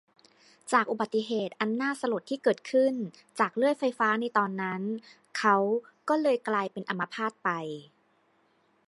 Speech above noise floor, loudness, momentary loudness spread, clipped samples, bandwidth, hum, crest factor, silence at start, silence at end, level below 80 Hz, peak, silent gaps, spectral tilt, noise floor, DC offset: 40 dB; -29 LUFS; 10 LU; under 0.1%; 11.5 kHz; none; 22 dB; 0.65 s; 1.05 s; -84 dBFS; -8 dBFS; none; -5 dB/octave; -68 dBFS; under 0.1%